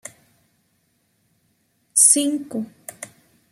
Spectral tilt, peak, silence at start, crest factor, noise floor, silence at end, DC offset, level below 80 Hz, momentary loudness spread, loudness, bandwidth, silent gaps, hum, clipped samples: -1 dB/octave; 0 dBFS; 1.95 s; 24 dB; -67 dBFS; 0.45 s; under 0.1%; -76 dBFS; 27 LU; -16 LUFS; 15.5 kHz; none; none; under 0.1%